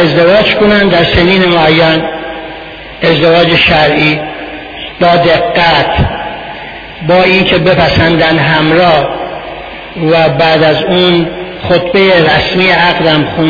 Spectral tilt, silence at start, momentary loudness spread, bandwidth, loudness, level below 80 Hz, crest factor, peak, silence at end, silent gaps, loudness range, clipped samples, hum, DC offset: -7 dB/octave; 0 s; 16 LU; 5.4 kHz; -7 LUFS; -30 dBFS; 8 dB; 0 dBFS; 0 s; none; 2 LU; 0.5%; none; under 0.1%